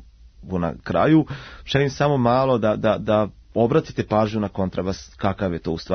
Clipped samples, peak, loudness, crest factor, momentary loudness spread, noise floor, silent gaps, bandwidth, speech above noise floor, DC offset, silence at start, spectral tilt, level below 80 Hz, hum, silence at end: under 0.1%; -6 dBFS; -22 LUFS; 16 dB; 9 LU; -43 dBFS; none; 6.6 kHz; 22 dB; under 0.1%; 0.4 s; -7 dB/octave; -46 dBFS; none; 0 s